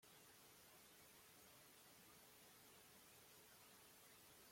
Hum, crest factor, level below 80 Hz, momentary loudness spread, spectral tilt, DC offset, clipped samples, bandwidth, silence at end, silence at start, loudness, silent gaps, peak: none; 14 dB; under -90 dBFS; 0 LU; -2 dB/octave; under 0.1%; under 0.1%; 16.5 kHz; 0 s; 0 s; -65 LUFS; none; -54 dBFS